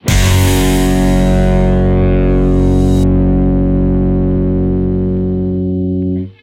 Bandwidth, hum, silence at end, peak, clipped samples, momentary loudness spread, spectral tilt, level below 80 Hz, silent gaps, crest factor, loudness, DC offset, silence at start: 16.5 kHz; none; 0.1 s; 0 dBFS; under 0.1%; 5 LU; -6.5 dB/octave; -16 dBFS; none; 10 dB; -13 LUFS; under 0.1%; 0.05 s